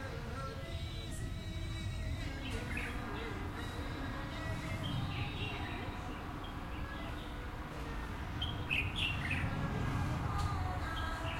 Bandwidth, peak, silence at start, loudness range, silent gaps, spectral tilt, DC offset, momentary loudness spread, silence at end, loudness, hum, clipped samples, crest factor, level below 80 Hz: 16.5 kHz; -22 dBFS; 0 s; 5 LU; none; -5.5 dB/octave; under 0.1%; 8 LU; 0 s; -40 LUFS; none; under 0.1%; 18 dB; -46 dBFS